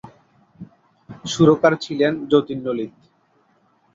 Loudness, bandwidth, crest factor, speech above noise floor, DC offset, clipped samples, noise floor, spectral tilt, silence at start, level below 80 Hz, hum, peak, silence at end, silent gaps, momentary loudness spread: -19 LUFS; 8 kHz; 20 dB; 43 dB; under 0.1%; under 0.1%; -61 dBFS; -6 dB/octave; 0.05 s; -58 dBFS; none; 0 dBFS; 1.05 s; none; 15 LU